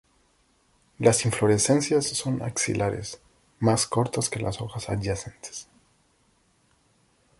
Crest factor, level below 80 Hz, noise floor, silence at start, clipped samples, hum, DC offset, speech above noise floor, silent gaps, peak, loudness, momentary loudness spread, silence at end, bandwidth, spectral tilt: 22 dB; -52 dBFS; -65 dBFS; 1 s; under 0.1%; none; under 0.1%; 40 dB; none; -6 dBFS; -25 LUFS; 16 LU; 1.75 s; 12 kHz; -4.5 dB/octave